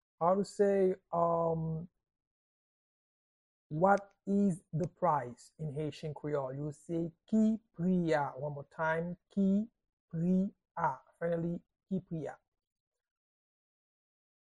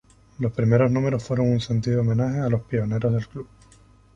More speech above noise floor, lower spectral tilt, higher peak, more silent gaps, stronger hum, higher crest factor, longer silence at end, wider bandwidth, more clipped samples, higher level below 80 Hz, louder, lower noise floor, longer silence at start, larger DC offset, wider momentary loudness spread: first, over 57 dB vs 31 dB; about the same, -8.5 dB/octave vs -8.5 dB/octave; second, -14 dBFS vs -6 dBFS; first, 2.27-3.70 s, 9.89-10.08 s vs none; neither; about the same, 22 dB vs 18 dB; first, 2.15 s vs 0.7 s; first, 11 kHz vs 7.6 kHz; neither; second, -68 dBFS vs -48 dBFS; second, -34 LUFS vs -23 LUFS; first, under -90 dBFS vs -53 dBFS; second, 0.2 s vs 0.4 s; neither; first, 12 LU vs 9 LU